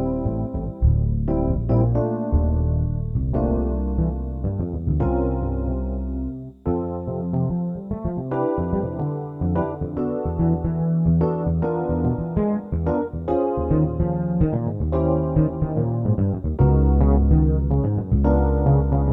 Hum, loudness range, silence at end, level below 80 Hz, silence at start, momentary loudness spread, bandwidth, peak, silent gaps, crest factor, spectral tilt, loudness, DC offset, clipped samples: none; 6 LU; 0 s; -26 dBFS; 0 s; 8 LU; 2.7 kHz; -6 dBFS; none; 16 dB; -13.5 dB/octave; -22 LUFS; under 0.1%; under 0.1%